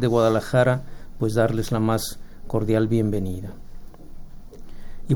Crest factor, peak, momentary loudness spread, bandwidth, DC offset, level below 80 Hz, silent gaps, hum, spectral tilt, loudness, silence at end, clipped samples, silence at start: 16 dB; -6 dBFS; 14 LU; over 20 kHz; under 0.1%; -38 dBFS; none; none; -6.5 dB/octave; -23 LUFS; 0 s; under 0.1%; 0 s